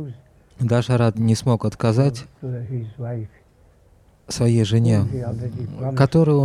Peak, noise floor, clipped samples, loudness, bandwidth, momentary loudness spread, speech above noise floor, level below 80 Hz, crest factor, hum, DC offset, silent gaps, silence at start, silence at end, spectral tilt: -4 dBFS; -54 dBFS; under 0.1%; -21 LUFS; 11.5 kHz; 14 LU; 34 dB; -48 dBFS; 16 dB; none; under 0.1%; none; 0 s; 0 s; -7.5 dB/octave